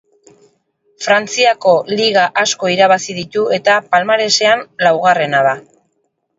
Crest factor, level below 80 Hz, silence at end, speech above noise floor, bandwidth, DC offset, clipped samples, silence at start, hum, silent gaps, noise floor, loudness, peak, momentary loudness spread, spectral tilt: 14 dB; -64 dBFS; 0.8 s; 53 dB; 8 kHz; under 0.1%; under 0.1%; 1 s; none; none; -66 dBFS; -13 LUFS; 0 dBFS; 5 LU; -2.5 dB/octave